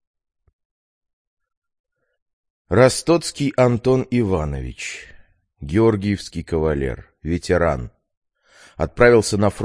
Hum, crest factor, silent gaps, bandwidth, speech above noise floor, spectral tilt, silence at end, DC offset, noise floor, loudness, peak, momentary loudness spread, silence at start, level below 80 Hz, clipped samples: none; 20 dB; 8.17-8.22 s; 10.5 kHz; 33 dB; -6 dB/octave; 0 s; under 0.1%; -51 dBFS; -19 LUFS; 0 dBFS; 14 LU; 2.7 s; -38 dBFS; under 0.1%